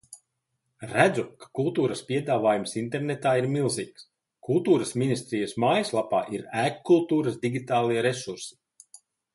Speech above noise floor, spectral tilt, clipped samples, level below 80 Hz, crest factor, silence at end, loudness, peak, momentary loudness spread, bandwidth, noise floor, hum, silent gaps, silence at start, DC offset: 53 dB; -5.5 dB/octave; under 0.1%; -68 dBFS; 22 dB; 0.85 s; -26 LUFS; -6 dBFS; 10 LU; 11.5 kHz; -79 dBFS; none; none; 0.1 s; under 0.1%